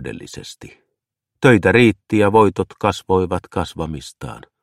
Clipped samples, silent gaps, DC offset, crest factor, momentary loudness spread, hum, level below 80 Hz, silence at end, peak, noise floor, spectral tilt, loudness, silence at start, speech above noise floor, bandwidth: under 0.1%; none; under 0.1%; 18 dB; 21 LU; none; -44 dBFS; 0.25 s; 0 dBFS; -79 dBFS; -6.5 dB/octave; -16 LUFS; 0 s; 61 dB; 13.5 kHz